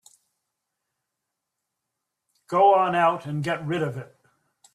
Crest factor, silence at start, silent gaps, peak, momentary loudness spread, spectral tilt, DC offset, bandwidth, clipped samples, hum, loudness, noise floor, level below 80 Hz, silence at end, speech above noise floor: 20 dB; 2.5 s; none; -8 dBFS; 11 LU; -6.5 dB/octave; under 0.1%; 13 kHz; under 0.1%; none; -22 LUFS; -83 dBFS; -70 dBFS; 0.7 s; 61 dB